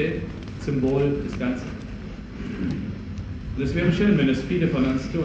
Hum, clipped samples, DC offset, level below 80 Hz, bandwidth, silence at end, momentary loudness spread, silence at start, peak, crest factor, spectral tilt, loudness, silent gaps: none; under 0.1%; under 0.1%; -38 dBFS; 8.2 kHz; 0 s; 15 LU; 0 s; -8 dBFS; 16 dB; -7.5 dB/octave; -25 LUFS; none